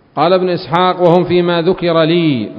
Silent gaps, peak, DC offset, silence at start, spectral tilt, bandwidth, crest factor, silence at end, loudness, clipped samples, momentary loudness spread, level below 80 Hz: none; 0 dBFS; under 0.1%; 0.15 s; -9 dB/octave; 5.4 kHz; 12 dB; 0 s; -12 LUFS; 0.1%; 3 LU; -48 dBFS